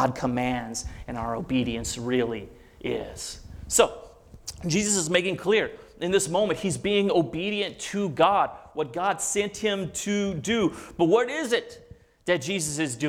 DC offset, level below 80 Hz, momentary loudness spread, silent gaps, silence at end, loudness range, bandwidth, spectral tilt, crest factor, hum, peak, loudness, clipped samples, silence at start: under 0.1%; -50 dBFS; 13 LU; none; 0 s; 4 LU; 17.5 kHz; -4 dB/octave; 22 dB; none; -4 dBFS; -26 LUFS; under 0.1%; 0 s